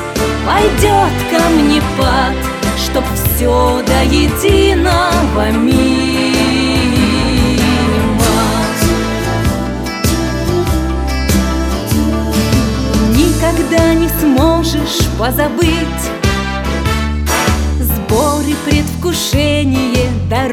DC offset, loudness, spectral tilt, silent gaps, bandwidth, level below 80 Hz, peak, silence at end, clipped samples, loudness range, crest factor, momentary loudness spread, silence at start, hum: under 0.1%; -13 LUFS; -5 dB/octave; none; 17.5 kHz; -20 dBFS; 0 dBFS; 0 s; under 0.1%; 3 LU; 12 dB; 5 LU; 0 s; none